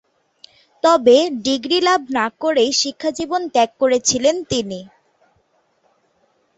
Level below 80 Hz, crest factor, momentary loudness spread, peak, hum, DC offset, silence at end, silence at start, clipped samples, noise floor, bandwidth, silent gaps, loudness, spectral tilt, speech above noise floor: -58 dBFS; 18 dB; 9 LU; -2 dBFS; none; under 0.1%; 1.7 s; 0.85 s; under 0.1%; -62 dBFS; 8.2 kHz; none; -17 LUFS; -2.5 dB/octave; 46 dB